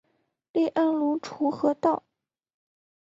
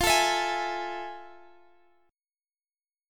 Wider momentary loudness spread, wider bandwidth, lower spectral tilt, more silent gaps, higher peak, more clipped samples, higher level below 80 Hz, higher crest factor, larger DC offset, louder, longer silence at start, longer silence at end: second, 6 LU vs 18 LU; second, 7.6 kHz vs 17.5 kHz; first, -6.5 dB/octave vs -1.5 dB/octave; neither; about the same, -10 dBFS vs -10 dBFS; neither; second, -72 dBFS vs -52 dBFS; about the same, 18 dB vs 22 dB; neither; about the same, -26 LUFS vs -27 LUFS; first, 0.55 s vs 0 s; second, 1.05 s vs 1.75 s